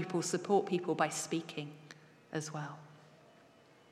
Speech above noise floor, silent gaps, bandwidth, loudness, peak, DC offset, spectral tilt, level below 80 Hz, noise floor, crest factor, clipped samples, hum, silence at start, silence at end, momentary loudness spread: 27 dB; none; 15 kHz; -36 LUFS; -18 dBFS; under 0.1%; -4.5 dB/octave; -90 dBFS; -63 dBFS; 20 dB; under 0.1%; none; 0 s; 0.75 s; 22 LU